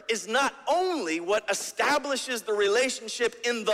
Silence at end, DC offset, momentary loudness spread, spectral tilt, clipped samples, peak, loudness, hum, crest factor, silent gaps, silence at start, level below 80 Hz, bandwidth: 0 s; under 0.1%; 5 LU; -1.5 dB/octave; under 0.1%; -12 dBFS; -27 LUFS; none; 16 dB; none; 0.1 s; -70 dBFS; 16 kHz